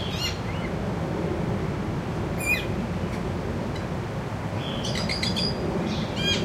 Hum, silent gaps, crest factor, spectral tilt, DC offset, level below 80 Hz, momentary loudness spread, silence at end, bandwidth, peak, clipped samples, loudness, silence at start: none; none; 16 dB; -5 dB/octave; under 0.1%; -40 dBFS; 6 LU; 0 s; 15.5 kHz; -12 dBFS; under 0.1%; -28 LUFS; 0 s